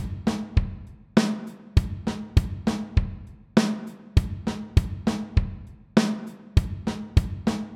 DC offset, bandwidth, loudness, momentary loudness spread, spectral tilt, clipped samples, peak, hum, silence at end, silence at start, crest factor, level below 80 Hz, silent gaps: under 0.1%; 13.5 kHz; -26 LUFS; 11 LU; -6.5 dB/octave; under 0.1%; -4 dBFS; none; 0 s; 0 s; 22 dB; -30 dBFS; none